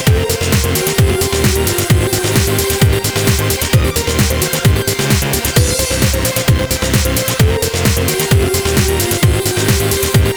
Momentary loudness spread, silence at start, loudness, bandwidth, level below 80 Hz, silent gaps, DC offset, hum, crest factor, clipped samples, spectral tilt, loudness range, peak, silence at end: 1 LU; 0 s; -13 LUFS; over 20 kHz; -22 dBFS; none; under 0.1%; none; 12 dB; under 0.1%; -4 dB/octave; 0 LU; 0 dBFS; 0 s